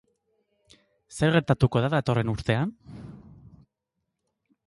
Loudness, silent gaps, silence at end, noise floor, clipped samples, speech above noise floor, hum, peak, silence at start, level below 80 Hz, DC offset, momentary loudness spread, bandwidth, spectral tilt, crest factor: -25 LUFS; none; 1.5 s; -82 dBFS; under 0.1%; 58 dB; none; -8 dBFS; 1.1 s; -50 dBFS; under 0.1%; 22 LU; 11.5 kHz; -7 dB/octave; 20 dB